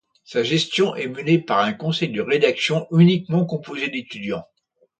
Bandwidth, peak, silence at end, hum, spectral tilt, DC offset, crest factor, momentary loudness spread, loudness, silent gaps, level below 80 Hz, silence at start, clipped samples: 9 kHz; -4 dBFS; 0.55 s; none; -6 dB/octave; under 0.1%; 18 dB; 12 LU; -21 LUFS; none; -64 dBFS; 0.3 s; under 0.1%